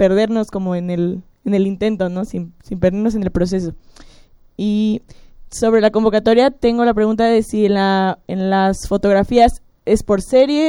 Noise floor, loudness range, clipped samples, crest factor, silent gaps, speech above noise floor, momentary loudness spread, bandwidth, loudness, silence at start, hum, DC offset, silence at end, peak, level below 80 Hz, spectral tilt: -45 dBFS; 6 LU; under 0.1%; 14 dB; none; 30 dB; 10 LU; 15.5 kHz; -16 LUFS; 0 s; none; under 0.1%; 0 s; -2 dBFS; -36 dBFS; -6.5 dB/octave